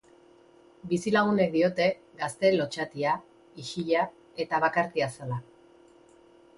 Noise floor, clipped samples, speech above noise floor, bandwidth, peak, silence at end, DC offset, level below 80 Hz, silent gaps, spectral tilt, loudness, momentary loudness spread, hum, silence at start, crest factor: -57 dBFS; under 0.1%; 30 dB; 11.5 kHz; -10 dBFS; 1.15 s; under 0.1%; -68 dBFS; none; -5.5 dB/octave; -28 LUFS; 12 LU; none; 0.85 s; 18 dB